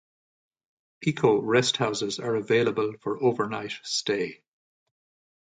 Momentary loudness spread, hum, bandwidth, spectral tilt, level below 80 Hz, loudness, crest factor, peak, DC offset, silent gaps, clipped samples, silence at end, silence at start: 8 LU; none; 9.4 kHz; -4.5 dB/octave; -68 dBFS; -26 LUFS; 20 dB; -8 dBFS; under 0.1%; none; under 0.1%; 1.2 s; 1 s